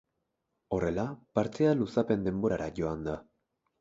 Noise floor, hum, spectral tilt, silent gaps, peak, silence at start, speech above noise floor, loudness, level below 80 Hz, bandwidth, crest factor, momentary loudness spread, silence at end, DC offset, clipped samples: -82 dBFS; none; -8 dB/octave; none; -12 dBFS; 0.7 s; 52 dB; -31 LUFS; -54 dBFS; 7.8 kHz; 20 dB; 9 LU; 0.6 s; under 0.1%; under 0.1%